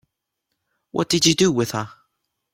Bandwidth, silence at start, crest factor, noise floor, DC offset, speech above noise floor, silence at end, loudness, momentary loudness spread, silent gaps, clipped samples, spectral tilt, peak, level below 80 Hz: 16.5 kHz; 0.95 s; 22 dB; -79 dBFS; under 0.1%; 59 dB; 0.6 s; -20 LUFS; 14 LU; none; under 0.1%; -3.5 dB/octave; -2 dBFS; -56 dBFS